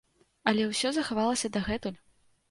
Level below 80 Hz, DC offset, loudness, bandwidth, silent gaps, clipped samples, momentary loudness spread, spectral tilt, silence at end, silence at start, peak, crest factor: -56 dBFS; under 0.1%; -29 LUFS; 11.5 kHz; none; under 0.1%; 7 LU; -3.5 dB/octave; 0.55 s; 0.45 s; -10 dBFS; 22 dB